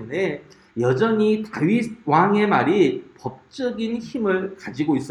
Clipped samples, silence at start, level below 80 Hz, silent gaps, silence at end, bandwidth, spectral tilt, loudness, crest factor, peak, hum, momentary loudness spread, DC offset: under 0.1%; 0 s; -62 dBFS; none; 0 s; 11 kHz; -7 dB/octave; -21 LUFS; 18 dB; -2 dBFS; none; 14 LU; under 0.1%